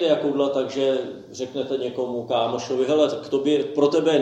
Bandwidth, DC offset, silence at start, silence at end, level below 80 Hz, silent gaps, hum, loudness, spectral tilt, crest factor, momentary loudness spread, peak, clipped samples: 8.8 kHz; under 0.1%; 0 s; 0 s; -70 dBFS; none; none; -23 LUFS; -5 dB/octave; 16 dB; 8 LU; -6 dBFS; under 0.1%